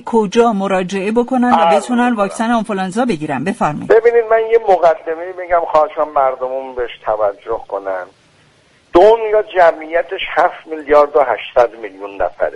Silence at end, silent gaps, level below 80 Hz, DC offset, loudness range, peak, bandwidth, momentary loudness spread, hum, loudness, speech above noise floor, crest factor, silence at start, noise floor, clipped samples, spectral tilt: 0 s; none; -46 dBFS; under 0.1%; 4 LU; 0 dBFS; 11.5 kHz; 11 LU; none; -14 LUFS; 37 dB; 14 dB; 0.05 s; -51 dBFS; under 0.1%; -5.5 dB/octave